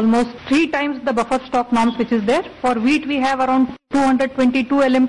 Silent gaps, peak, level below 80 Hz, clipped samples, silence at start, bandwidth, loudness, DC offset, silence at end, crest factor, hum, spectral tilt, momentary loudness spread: none; -8 dBFS; -50 dBFS; under 0.1%; 0 s; 11 kHz; -18 LUFS; 0.4%; 0 s; 10 dB; none; -5 dB/octave; 4 LU